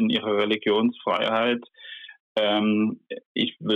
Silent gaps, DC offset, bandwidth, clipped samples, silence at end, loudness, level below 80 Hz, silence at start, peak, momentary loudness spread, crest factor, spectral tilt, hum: 2.20-2.35 s, 3.26-3.35 s; under 0.1%; 6 kHz; under 0.1%; 0 s; -24 LUFS; -72 dBFS; 0 s; -12 dBFS; 17 LU; 12 dB; -7 dB/octave; none